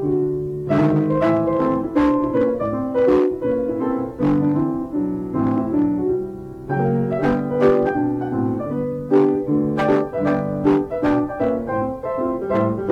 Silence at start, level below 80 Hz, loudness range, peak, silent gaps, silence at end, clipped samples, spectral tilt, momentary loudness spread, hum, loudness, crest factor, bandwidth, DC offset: 0 s; -44 dBFS; 2 LU; -4 dBFS; none; 0 s; under 0.1%; -9.5 dB/octave; 7 LU; none; -20 LUFS; 16 dB; 6.4 kHz; under 0.1%